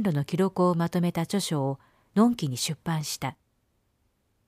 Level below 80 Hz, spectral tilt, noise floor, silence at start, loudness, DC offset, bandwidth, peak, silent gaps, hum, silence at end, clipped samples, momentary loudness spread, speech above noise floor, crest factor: -64 dBFS; -5.5 dB/octave; -72 dBFS; 0 s; -27 LUFS; under 0.1%; 15.5 kHz; -10 dBFS; none; none; 1.15 s; under 0.1%; 8 LU; 45 dB; 18 dB